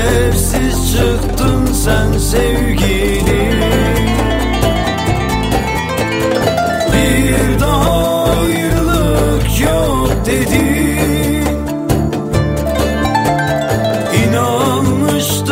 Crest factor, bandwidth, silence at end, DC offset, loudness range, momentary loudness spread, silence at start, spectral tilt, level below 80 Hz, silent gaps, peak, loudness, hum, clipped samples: 12 dB; 16.5 kHz; 0 s; under 0.1%; 2 LU; 3 LU; 0 s; -5 dB/octave; -20 dBFS; none; 0 dBFS; -14 LUFS; none; under 0.1%